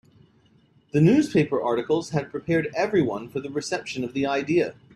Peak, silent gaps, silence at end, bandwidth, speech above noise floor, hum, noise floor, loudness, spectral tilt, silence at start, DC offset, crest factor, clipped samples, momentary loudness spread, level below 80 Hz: -8 dBFS; none; 0.25 s; 12 kHz; 36 dB; none; -59 dBFS; -24 LUFS; -6.5 dB/octave; 0.95 s; under 0.1%; 16 dB; under 0.1%; 10 LU; -60 dBFS